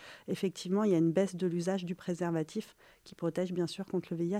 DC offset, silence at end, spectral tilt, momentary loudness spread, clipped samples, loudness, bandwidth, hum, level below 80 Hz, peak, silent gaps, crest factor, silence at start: under 0.1%; 0 s; -6.5 dB/octave; 11 LU; under 0.1%; -33 LUFS; 15 kHz; none; -74 dBFS; -16 dBFS; none; 16 dB; 0 s